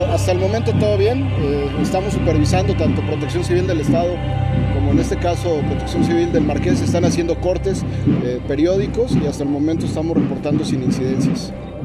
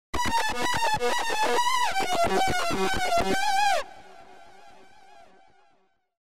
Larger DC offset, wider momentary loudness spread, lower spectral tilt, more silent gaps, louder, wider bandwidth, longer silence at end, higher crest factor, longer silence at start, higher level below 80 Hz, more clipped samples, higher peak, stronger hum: second, under 0.1% vs 3%; about the same, 4 LU vs 3 LU; first, -7 dB/octave vs -2.5 dB/octave; neither; first, -18 LUFS vs -25 LUFS; second, 13 kHz vs 16 kHz; second, 0 s vs 0.15 s; about the same, 14 dB vs 12 dB; about the same, 0 s vs 0.1 s; first, -30 dBFS vs -48 dBFS; neither; first, -4 dBFS vs -14 dBFS; neither